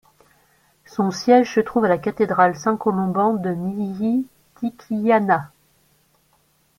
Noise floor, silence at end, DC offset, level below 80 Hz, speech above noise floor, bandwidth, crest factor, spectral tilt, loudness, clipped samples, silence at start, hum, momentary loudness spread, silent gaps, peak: -62 dBFS; 1.3 s; under 0.1%; -60 dBFS; 43 dB; 15.5 kHz; 20 dB; -6.5 dB/octave; -20 LUFS; under 0.1%; 0.95 s; none; 13 LU; none; -2 dBFS